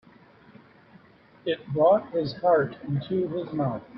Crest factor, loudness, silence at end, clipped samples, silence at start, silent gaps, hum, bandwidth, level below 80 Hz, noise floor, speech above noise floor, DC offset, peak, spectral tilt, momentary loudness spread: 18 dB; -26 LUFS; 0 s; under 0.1%; 1.45 s; none; none; 5.8 kHz; -64 dBFS; -55 dBFS; 30 dB; under 0.1%; -10 dBFS; -10 dB/octave; 10 LU